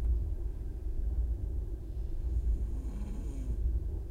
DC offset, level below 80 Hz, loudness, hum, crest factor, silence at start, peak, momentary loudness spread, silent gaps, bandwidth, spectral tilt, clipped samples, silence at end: under 0.1%; -34 dBFS; -38 LUFS; none; 10 dB; 0 s; -22 dBFS; 6 LU; none; 7 kHz; -9 dB/octave; under 0.1%; 0 s